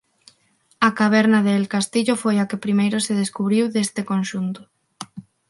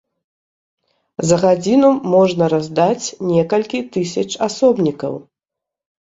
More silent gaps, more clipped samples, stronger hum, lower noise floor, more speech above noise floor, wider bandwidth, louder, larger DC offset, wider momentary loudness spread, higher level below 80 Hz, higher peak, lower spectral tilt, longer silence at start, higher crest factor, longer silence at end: neither; neither; neither; second, -62 dBFS vs -84 dBFS; second, 42 dB vs 69 dB; first, 11.5 kHz vs 8 kHz; second, -20 LUFS vs -16 LUFS; neither; first, 17 LU vs 10 LU; second, -68 dBFS vs -56 dBFS; about the same, 0 dBFS vs -2 dBFS; about the same, -5 dB/octave vs -5.5 dB/octave; second, 0.8 s vs 1.2 s; about the same, 20 dB vs 16 dB; second, 0.3 s vs 0.8 s